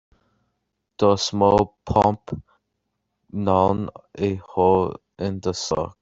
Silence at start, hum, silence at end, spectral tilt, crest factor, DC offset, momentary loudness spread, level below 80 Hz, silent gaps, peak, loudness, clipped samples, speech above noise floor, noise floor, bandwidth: 1 s; none; 0.1 s; -6 dB/octave; 20 dB; under 0.1%; 13 LU; -48 dBFS; none; -4 dBFS; -22 LUFS; under 0.1%; 56 dB; -77 dBFS; 8 kHz